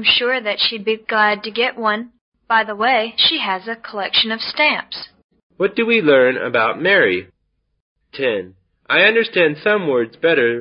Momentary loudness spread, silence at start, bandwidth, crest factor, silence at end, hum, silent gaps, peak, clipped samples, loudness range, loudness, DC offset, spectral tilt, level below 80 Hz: 10 LU; 0 s; 5.6 kHz; 16 dB; 0 s; none; 2.21-2.32 s, 5.24-5.29 s, 5.43-5.50 s, 7.81-7.96 s; -2 dBFS; under 0.1%; 1 LU; -16 LUFS; under 0.1%; -9 dB/octave; -62 dBFS